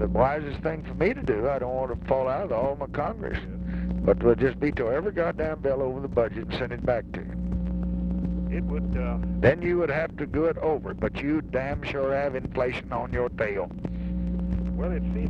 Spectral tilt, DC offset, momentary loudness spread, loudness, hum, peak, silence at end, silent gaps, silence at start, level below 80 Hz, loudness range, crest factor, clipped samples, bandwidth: -9 dB/octave; under 0.1%; 8 LU; -27 LUFS; none; -6 dBFS; 0 s; none; 0 s; -36 dBFS; 3 LU; 20 dB; under 0.1%; 6.4 kHz